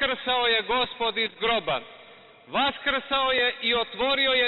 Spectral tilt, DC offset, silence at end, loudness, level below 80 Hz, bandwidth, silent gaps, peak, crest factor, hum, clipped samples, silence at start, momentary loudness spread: -6.5 dB/octave; under 0.1%; 0 s; -24 LUFS; -56 dBFS; 4.8 kHz; none; -12 dBFS; 14 dB; none; under 0.1%; 0 s; 5 LU